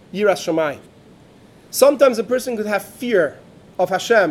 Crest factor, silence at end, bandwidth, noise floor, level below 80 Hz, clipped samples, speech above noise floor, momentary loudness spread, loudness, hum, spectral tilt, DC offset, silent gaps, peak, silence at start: 18 dB; 0 s; 16.5 kHz; -47 dBFS; -62 dBFS; under 0.1%; 30 dB; 10 LU; -18 LUFS; none; -4 dB/octave; under 0.1%; none; 0 dBFS; 0.15 s